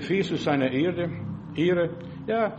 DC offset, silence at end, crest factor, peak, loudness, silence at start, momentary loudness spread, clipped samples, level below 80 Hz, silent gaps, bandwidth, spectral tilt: under 0.1%; 0 s; 16 dB; -10 dBFS; -26 LUFS; 0 s; 10 LU; under 0.1%; -58 dBFS; none; 8.4 kHz; -7 dB/octave